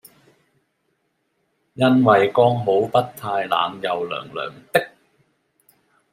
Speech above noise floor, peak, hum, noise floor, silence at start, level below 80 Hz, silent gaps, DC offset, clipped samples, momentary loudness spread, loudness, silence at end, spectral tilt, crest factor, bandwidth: 52 dB; -2 dBFS; none; -70 dBFS; 1.75 s; -66 dBFS; none; under 0.1%; under 0.1%; 13 LU; -20 LUFS; 1.25 s; -6.5 dB/octave; 20 dB; 16 kHz